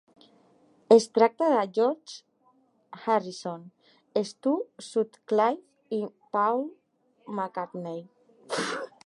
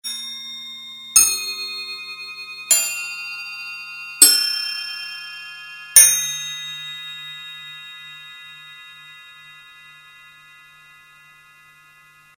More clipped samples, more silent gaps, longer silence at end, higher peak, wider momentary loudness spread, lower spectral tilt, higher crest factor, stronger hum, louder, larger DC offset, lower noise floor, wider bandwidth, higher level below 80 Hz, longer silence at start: neither; neither; second, 0.2 s vs 2.1 s; second, -6 dBFS vs 0 dBFS; second, 17 LU vs 25 LU; first, -5 dB/octave vs 3 dB/octave; about the same, 22 dB vs 24 dB; neither; second, -27 LUFS vs -16 LUFS; neither; first, -66 dBFS vs -50 dBFS; second, 11.5 kHz vs 19 kHz; second, -84 dBFS vs -66 dBFS; first, 0.9 s vs 0.05 s